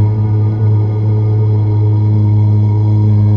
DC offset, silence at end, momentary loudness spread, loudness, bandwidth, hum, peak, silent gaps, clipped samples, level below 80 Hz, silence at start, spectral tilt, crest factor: under 0.1%; 0 s; 2 LU; -12 LUFS; 3.4 kHz; none; -4 dBFS; none; under 0.1%; -32 dBFS; 0 s; -11.5 dB/octave; 6 dB